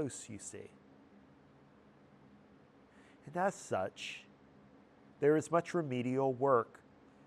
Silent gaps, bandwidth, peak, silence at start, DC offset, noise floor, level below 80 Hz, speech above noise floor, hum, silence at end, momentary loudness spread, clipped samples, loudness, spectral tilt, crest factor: none; 12.5 kHz; -18 dBFS; 0 s; under 0.1%; -63 dBFS; -78 dBFS; 28 dB; none; 0.6 s; 17 LU; under 0.1%; -35 LUFS; -5.5 dB/octave; 22 dB